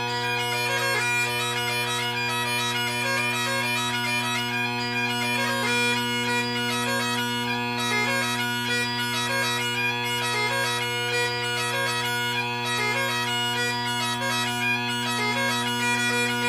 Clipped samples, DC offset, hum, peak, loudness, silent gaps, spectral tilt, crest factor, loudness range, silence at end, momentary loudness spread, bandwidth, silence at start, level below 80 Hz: under 0.1%; under 0.1%; none; -12 dBFS; -24 LUFS; none; -2.5 dB/octave; 14 dB; 1 LU; 0 s; 3 LU; 16 kHz; 0 s; -62 dBFS